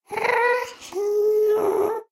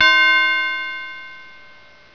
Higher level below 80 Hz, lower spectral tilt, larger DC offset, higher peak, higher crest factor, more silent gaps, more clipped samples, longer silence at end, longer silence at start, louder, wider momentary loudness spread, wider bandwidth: second, -70 dBFS vs -62 dBFS; first, -3.5 dB/octave vs 0 dB/octave; second, under 0.1% vs 0.7%; second, -8 dBFS vs -2 dBFS; about the same, 14 dB vs 18 dB; neither; neither; second, 0.1 s vs 0.7 s; about the same, 0.1 s vs 0 s; second, -22 LUFS vs -15 LUFS; second, 7 LU vs 22 LU; first, 15 kHz vs 5.4 kHz